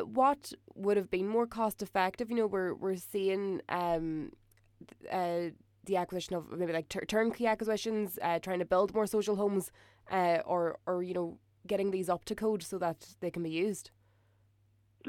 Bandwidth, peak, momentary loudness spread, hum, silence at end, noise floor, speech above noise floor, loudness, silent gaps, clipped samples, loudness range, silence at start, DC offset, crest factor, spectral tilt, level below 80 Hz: 18 kHz; -16 dBFS; 9 LU; none; 0 s; -69 dBFS; 36 dB; -33 LUFS; none; under 0.1%; 4 LU; 0 s; under 0.1%; 18 dB; -5.5 dB/octave; -64 dBFS